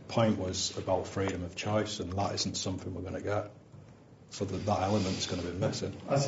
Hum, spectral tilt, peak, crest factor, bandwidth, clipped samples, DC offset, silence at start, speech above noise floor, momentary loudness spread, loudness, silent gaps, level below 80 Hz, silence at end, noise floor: none; -5 dB/octave; -14 dBFS; 20 dB; 8 kHz; under 0.1%; under 0.1%; 0 s; 22 dB; 8 LU; -33 LUFS; none; -66 dBFS; 0 s; -54 dBFS